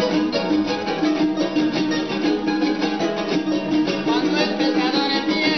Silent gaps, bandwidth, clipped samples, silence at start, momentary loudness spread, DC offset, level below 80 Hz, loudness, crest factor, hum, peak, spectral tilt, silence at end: none; 6.4 kHz; under 0.1%; 0 s; 3 LU; 0.3%; -56 dBFS; -20 LUFS; 14 dB; none; -6 dBFS; -5 dB/octave; 0 s